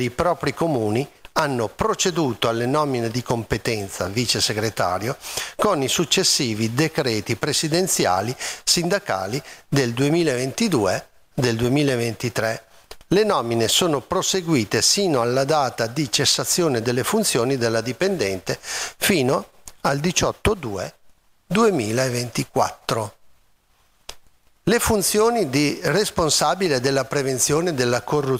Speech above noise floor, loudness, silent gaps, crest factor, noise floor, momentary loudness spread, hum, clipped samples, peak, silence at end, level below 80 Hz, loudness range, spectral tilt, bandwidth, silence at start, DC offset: 39 dB; -21 LUFS; none; 20 dB; -60 dBFS; 8 LU; none; under 0.1%; -2 dBFS; 0 s; -46 dBFS; 4 LU; -3.5 dB/octave; 16 kHz; 0 s; under 0.1%